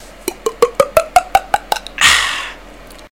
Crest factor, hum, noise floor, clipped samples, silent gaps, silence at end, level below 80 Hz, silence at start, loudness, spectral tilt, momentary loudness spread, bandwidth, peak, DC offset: 16 dB; none; -37 dBFS; 0.3%; none; 0.2 s; -38 dBFS; 0 s; -14 LUFS; -1 dB/octave; 13 LU; 19 kHz; 0 dBFS; 0.5%